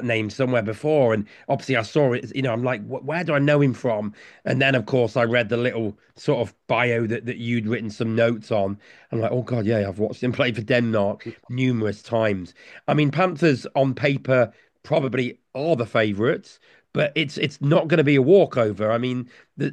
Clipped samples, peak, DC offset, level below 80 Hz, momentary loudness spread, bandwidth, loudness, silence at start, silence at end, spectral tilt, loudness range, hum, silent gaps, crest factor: under 0.1%; -4 dBFS; under 0.1%; -64 dBFS; 9 LU; 9.6 kHz; -22 LUFS; 0 s; 0 s; -7 dB/octave; 3 LU; none; none; 18 dB